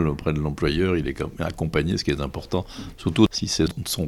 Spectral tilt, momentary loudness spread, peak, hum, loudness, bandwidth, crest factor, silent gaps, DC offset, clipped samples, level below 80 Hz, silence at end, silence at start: -5.5 dB/octave; 9 LU; -2 dBFS; none; -24 LUFS; 15.5 kHz; 22 dB; none; under 0.1%; under 0.1%; -38 dBFS; 0 s; 0 s